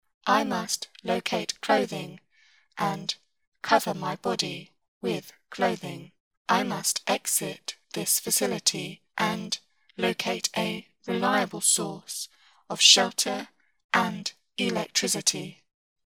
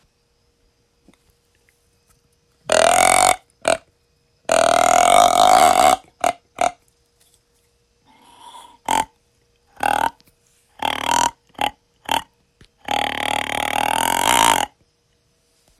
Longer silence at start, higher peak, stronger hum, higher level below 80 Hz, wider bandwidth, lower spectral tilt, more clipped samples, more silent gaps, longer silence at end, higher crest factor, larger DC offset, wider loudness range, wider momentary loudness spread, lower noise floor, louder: second, 0.25 s vs 2.7 s; about the same, -2 dBFS vs 0 dBFS; neither; second, -72 dBFS vs -50 dBFS; first, over 20 kHz vs 16.5 kHz; about the same, -2 dB/octave vs -1 dB/octave; neither; first, 3.47-3.52 s, 4.88-5.01 s, 6.20-6.31 s, 6.37-6.45 s, 13.84-13.89 s vs none; second, 0.55 s vs 1.1 s; first, 26 dB vs 20 dB; neither; second, 7 LU vs 11 LU; about the same, 15 LU vs 13 LU; about the same, -63 dBFS vs -64 dBFS; second, -26 LUFS vs -17 LUFS